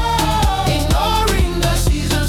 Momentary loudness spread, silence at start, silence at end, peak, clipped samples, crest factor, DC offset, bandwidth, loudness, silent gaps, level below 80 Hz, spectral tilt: 2 LU; 0 s; 0 s; -4 dBFS; under 0.1%; 10 dB; under 0.1%; 19 kHz; -17 LUFS; none; -20 dBFS; -4.5 dB/octave